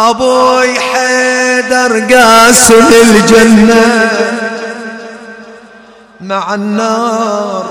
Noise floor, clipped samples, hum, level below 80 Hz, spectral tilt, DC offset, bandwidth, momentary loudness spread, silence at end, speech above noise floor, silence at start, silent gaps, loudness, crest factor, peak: -37 dBFS; 3%; none; -38 dBFS; -3 dB/octave; under 0.1%; over 20 kHz; 15 LU; 0 s; 30 dB; 0 s; none; -7 LUFS; 8 dB; 0 dBFS